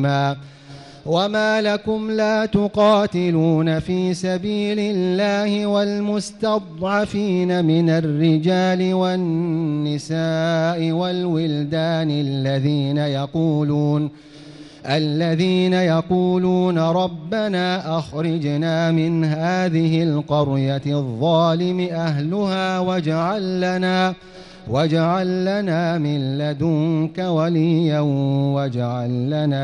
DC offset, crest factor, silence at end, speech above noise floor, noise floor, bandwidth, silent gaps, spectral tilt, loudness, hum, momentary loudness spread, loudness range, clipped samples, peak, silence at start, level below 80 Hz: under 0.1%; 12 dB; 0 s; 21 dB; -40 dBFS; 10.5 kHz; none; -7 dB/octave; -20 LUFS; none; 5 LU; 2 LU; under 0.1%; -6 dBFS; 0 s; -54 dBFS